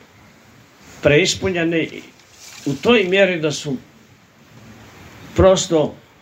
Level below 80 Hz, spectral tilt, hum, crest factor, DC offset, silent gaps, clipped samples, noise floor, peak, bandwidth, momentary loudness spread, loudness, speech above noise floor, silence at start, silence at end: -42 dBFS; -4.5 dB/octave; none; 20 dB; under 0.1%; none; under 0.1%; -49 dBFS; 0 dBFS; 16 kHz; 14 LU; -17 LUFS; 32 dB; 0.95 s; 0.25 s